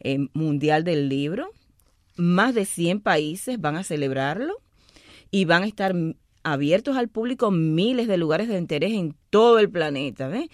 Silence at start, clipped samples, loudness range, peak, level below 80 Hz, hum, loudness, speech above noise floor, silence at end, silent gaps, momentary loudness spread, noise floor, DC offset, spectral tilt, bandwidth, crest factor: 0.05 s; under 0.1%; 3 LU; -6 dBFS; -60 dBFS; none; -23 LUFS; 39 dB; 0.05 s; none; 9 LU; -61 dBFS; under 0.1%; -6 dB/octave; 15 kHz; 18 dB